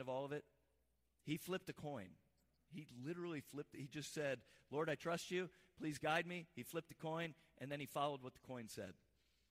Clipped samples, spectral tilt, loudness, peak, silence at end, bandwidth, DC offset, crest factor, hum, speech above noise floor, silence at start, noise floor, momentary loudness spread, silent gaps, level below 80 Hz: under 0.1%; -5 dB/octave; -47 LUFS; -28 dBFS; 0.6 s; 15.5 kHz; under 0.1%; 20 dB; none; 36 dB; 0 s; -83 dBFS; 11 LU; none; -82 dBFS